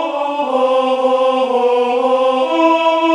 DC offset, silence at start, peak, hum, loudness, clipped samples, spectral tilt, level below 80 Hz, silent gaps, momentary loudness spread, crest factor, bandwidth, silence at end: under 0.1%; 0 s; -2 dBFS; none; -14 LUFS; under 0.1%; -3 dB/octave; -70 dBFS; none; 4 LU; 12 dB; 10 kHz; 0 s